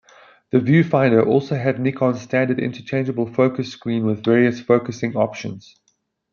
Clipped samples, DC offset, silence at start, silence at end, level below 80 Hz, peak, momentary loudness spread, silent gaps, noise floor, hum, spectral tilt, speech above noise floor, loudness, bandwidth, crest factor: under 0.1%; under 0.1%; 0.55 s; 0.7 s; -62 dBFS; -2 dBFS; 9 LU; none; -68 dBFS; none; -8 dB/octave; 49 dB; -19 LUFS; 7 kHz; 16 dB